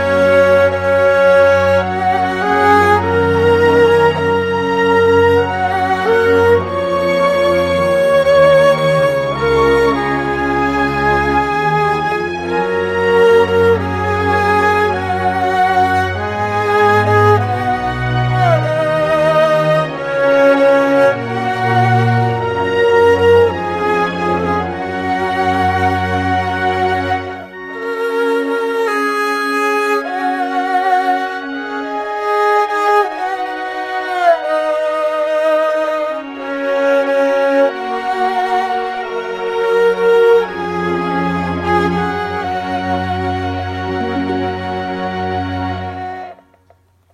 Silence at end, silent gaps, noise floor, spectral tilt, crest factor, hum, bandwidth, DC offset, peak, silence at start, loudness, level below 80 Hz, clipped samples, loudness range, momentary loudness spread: 0.8 s; none; -52 dBFS; -6.5 dB/octave; 14 dB; none; 14 kHz; under 0.1%; 0 dBFS; 0 s; -14 LUFS; -42 dBFS; under 0.1%; 5 LU; 10 LU